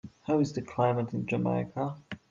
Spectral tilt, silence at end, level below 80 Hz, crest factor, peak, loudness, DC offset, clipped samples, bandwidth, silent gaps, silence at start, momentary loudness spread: -8 dB/octave; 0.15 s; -66 dBFS; 16 dB; -14 dBFS; -30 LUFS; under 0.1%; under 0.1%; 7.6 kHz; none; 0.05 s; 7 LU